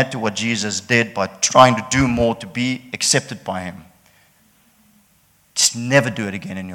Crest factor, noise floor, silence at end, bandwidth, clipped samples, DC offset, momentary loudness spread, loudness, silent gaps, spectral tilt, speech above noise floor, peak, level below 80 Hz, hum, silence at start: 20 dB; -57 dBFS; 0 s; 18 kHz; under 0.1%; under 0.1%; 14 LU; -18 LUFS; none; -3.5 dB/octave; 39 dB; 0 dBFS; -46 dBFS; none; 0 s